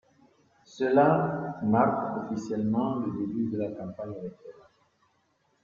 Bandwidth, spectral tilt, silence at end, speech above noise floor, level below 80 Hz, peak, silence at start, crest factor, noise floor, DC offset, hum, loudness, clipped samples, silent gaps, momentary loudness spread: 7.2 kHz; -8.5 dB/octave; 1.1 s; 44 dB; -66 dBFS; -8 dBFS; 0.7 s; 20 dB; -71 dBFS; under 0.1%; none; -28 LUFS; under 0.1%; none; 15 LU